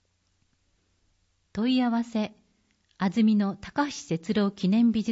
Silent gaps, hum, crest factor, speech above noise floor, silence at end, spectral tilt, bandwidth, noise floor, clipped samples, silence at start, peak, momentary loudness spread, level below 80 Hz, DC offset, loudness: none; none; 14 dB; 46 dB; 0 s; -6.5 dB/octave; 8 kHz; -71 dBFS; under 0.1%; 1.55 s; -14 dBFS; 9 LU; -62 dBFS; under 0.1%; -26 LUFS